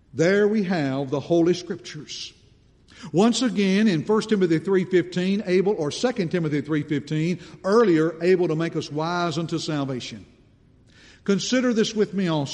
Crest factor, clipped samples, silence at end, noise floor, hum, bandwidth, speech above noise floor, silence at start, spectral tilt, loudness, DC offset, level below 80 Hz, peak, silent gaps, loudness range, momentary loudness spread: 16 dB; under 0.1%; 0 s; -55 dBFS; none; 10.5 kHz; 33 dB; 0.15 s; -6 dB/octave; -23 LUFS; under 0.1%; -60 dBFS; -6 dBFS; none; 4 LU; 13 LU